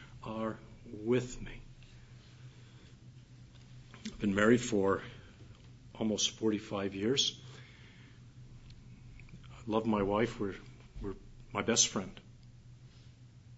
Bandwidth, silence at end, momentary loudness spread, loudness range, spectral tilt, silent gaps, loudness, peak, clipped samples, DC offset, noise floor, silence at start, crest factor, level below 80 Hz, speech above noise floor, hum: 7.6 kHz; 0 s; 27 LU; 8 LU; -3.5 dB/octave; none; -33 LUFS; -12 dBFS; under 0.1%; under 0.1%; -56 dBFS; 0 s; 24 dB; -56 dBFS; 24 dB; none